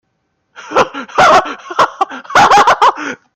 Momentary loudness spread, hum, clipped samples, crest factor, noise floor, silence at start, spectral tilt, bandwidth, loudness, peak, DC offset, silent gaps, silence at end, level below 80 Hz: 11 LU; none; under 0.1%; 12 dB; -66 dBFS; 0.6 s; -2.5 dB/octave; 16 kHz; -11 LUFS; 0 dBFS; under 0.1%; none; 0.2 s; -48 dBFS